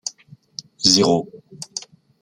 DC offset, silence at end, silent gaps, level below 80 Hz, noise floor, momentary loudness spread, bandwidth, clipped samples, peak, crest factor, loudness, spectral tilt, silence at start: under 0.1%; 0.4 s; none; -58 dBFS; -48 dBFS; 23 LU; 16.5 kHz; under 0.1%; -2 dBFS; 22 dB; -16 LUFS; -3.5 dB/octave; 0.05 s